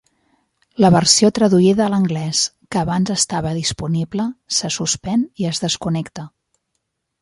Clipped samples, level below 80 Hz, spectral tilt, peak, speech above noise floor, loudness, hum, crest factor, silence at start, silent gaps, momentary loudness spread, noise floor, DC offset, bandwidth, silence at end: under 0.1%; -48 dBFS; -4.5 dB/octave; 0 dBFS; 57 dB; -17 LUFS; none; 18 dB; 0.8 s; none; 11 LU; -74 dBFS; under 0.1%; 11.5 kHz; 0.95 s